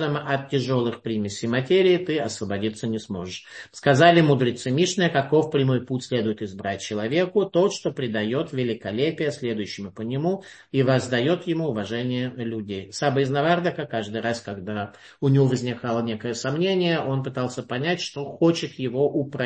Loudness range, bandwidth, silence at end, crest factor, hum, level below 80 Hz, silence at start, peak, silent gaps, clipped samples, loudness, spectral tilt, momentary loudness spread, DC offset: 5 LU; 8.8 kHz; 0 s; 20 dB; none; -64 dBFS; 0 s; -2 dBFS; none; under 0.1%; -24 LUFS; -6 dB/octave; 10 LU; under 0.1%